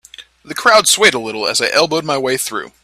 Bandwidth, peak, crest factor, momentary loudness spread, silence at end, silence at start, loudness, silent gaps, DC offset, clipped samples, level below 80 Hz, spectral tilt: 16.5 kHz; 0 dBFS; 16 dB; 10 LU; 0.15 s; 0.2 s; -13 LUFS; none; under 0.1%; under 0.1%; -56 dBFS; -1.5 dB/octave